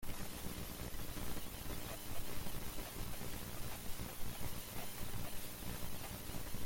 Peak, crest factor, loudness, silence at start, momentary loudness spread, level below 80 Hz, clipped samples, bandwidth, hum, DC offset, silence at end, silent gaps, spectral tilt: -28 dBFS; 12 dB; -47 LUFS; 0 s; 1 LU; -50 dBFS; under 0.1%; 17 kHz; 60 Hz at -55 dBFS; under 0.1%; 0 s; none; -3.5 dB/octave